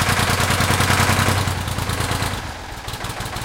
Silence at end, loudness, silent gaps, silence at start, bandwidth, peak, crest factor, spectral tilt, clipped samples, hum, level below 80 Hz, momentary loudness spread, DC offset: 0 s; -19 LUFS; none; 0 s; 17 kHz; -2 dBFS; 18 dB; -3.5 dB/octave; under 0.1%; none; -34 dBFS; 12 LU; under 0.1%